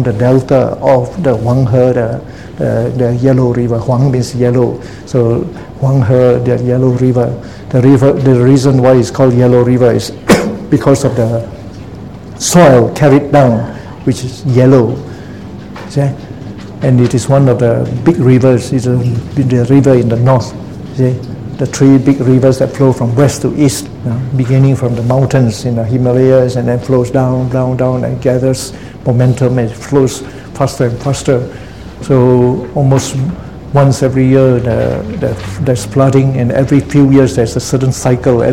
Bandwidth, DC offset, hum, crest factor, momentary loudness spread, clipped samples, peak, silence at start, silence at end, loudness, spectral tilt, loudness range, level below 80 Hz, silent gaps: 14 kHz; 0.8%; none; 10 dB; 12 LU; 0.6%; 0 dBFS; 0 s; 0 s; -11 LUFS; -7 dB/octave; 4 LU; -36 dBFS; none